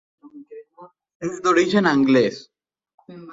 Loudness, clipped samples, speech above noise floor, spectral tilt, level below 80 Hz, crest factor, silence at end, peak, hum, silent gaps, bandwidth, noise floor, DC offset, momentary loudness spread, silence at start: -19 LUFS; under 0.1%; 30 dB; -5.5 dB/octave; -64 dBFS; 18 dB; 0 s; -4 dBFS; none; 1.15-1.20 s, 2.94-2.98 s; 7.8 kHz; -48 dBFS; under 0.1%; 24 LU; 0.35 s